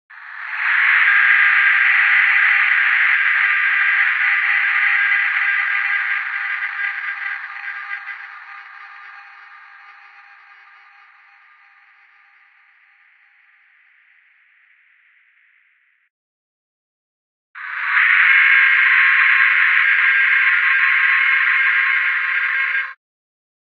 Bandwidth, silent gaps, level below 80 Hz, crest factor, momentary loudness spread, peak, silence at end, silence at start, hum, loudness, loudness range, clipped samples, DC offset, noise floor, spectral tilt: 6.4 kHz; 16.10-17.54 s; under -90 dBFS; 18 dB; 17 LU; 0 dBFS; 0.75 s; 0.1 s; none; -13 LUFS; 15 LU; under 0.1%; under 0.1%; -60 dBFS; 6 dB/octave